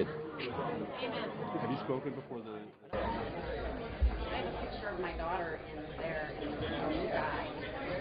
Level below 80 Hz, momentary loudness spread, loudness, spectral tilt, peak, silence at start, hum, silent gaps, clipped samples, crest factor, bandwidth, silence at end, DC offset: -44 dBFS; 7 LU; -38 LUFS; -4.5 dB/octave; -20 dBFS; 0 s; none; none; under 0.1%; 18 dB; 5 kHz; 0 s; under 0.1%